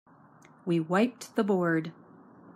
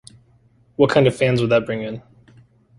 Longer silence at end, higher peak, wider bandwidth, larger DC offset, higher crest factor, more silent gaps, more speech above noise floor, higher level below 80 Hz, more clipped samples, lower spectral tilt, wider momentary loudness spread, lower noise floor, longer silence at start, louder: second, 0.05 s vs 0.8 s; second, -14 dBFS vs -2 dBFS; first, 14.5 kHz vs 11.5 kHz; neither; about the same, 16 dB vs 18 dB; neither; second, 29 dB vs 39 dB; second, -80 dBFS vs -52 dBFS; neither; about the same, -6.5 dB/octave vs -6.5 dB/octave; second, 10 LU vs 18 LU; about the same, -57 dBFS vs -56 dBFS; second, 0.65 s vs 0.8 s; second, -28 LUFS vs -18 LUFS